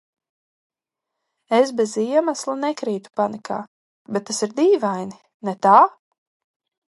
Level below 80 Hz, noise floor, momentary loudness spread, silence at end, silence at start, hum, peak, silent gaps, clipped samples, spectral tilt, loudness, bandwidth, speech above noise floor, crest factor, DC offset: -76 dBFS; -84 dBFS; 15 LU; 1.05 s; 1.5 s; none; 0 dBFS; 3.67-4.05 s, 5.34-5.40 s; under 0.1%; -4.5 dB/octave; -20 LUFS; 11.5 kHz; 65 dB; 22 dB; under 0.1%